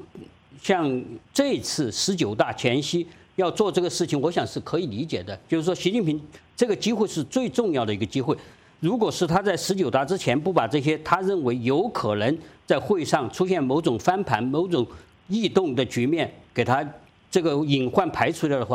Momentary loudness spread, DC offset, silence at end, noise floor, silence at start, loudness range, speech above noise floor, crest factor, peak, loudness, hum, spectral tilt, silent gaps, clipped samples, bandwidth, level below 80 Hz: 6 LU; under 0.1%; 0 s; -46 dBFS; 0 s; 2 LU; 22 dB; 20 dB; -4 dBFS; -24 LUFS; none; -5 dB/octave; none; under 0.1%; 16 kHz; -58 dBFS